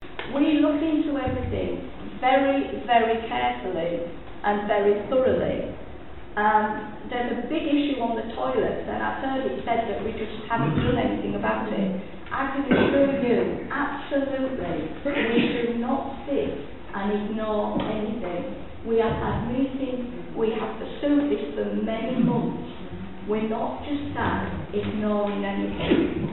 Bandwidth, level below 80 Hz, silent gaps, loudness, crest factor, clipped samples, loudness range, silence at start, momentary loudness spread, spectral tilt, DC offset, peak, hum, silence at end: 4.2 kHz; -46 dBFS; none; -25 LUFS; 18 dB; under 0.1%; 4 LU; 0 s; 11 LU; -5 dB/octave; 1%; -6 dBFS; none; 0 s